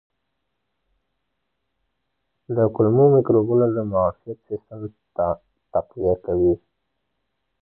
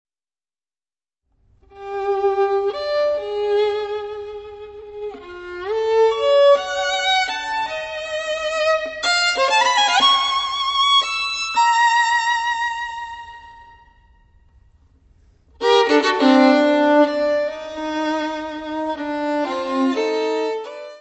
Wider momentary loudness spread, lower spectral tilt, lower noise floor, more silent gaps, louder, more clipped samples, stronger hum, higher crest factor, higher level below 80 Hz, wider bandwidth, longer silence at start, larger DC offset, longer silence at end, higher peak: about the same, 17 LU vs 17 LU; first, -14.5 dB/octave vs -1.5 dB/octave; second, -77 dBFS vs under -90 dBFS; neither; about the same, -20 LUFS vs -18 LUFS; neither; neither; about the same, 18 dB vs 18 dB; first, -48 dBFS vs -56 dBFS; second, 1.7 kHz vs 8.4 kHz; first, 2.5 s vs 1.75 s; neither; first, 1.05 s vs 0 s; second, -6 dBFS vs -2 dBFS